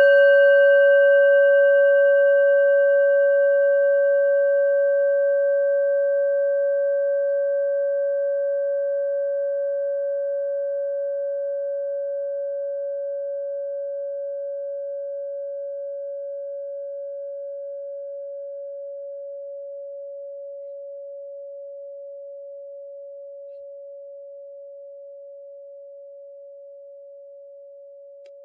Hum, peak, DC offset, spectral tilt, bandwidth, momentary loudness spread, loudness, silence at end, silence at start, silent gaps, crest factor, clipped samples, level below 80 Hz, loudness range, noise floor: none; -8 dBFS; under 0.1%; 5.5 dB/octave; 3 kHz; 24 LU; -21 LUFS; 0 s; 0 s; none; 14 dB; under 0.1%; under -90 dBFS; 23 LU; -44 dBFS